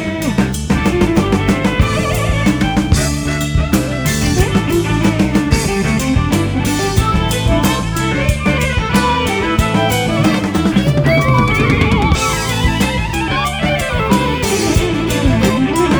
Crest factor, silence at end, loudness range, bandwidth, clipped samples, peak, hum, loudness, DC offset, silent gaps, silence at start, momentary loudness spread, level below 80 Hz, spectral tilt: 14 dB; 0 s; 2 LU; over 20 kHz; under 0.1%; 0 dBFS; none; -14 LUFS; under 0.1%; none; 0 s; 3 LU; -22 dBFS; -5.5 dB/octave